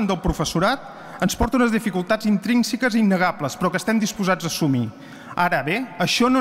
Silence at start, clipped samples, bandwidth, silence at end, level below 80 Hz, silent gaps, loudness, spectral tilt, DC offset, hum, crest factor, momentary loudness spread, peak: 0 s; under 0.1%; 16 kHz; 0 s; -40 dBFS; none; -21 LUFS; -5 dB/octave; under 0.1%; none; 14 dB; 6 LU; -6 dBFS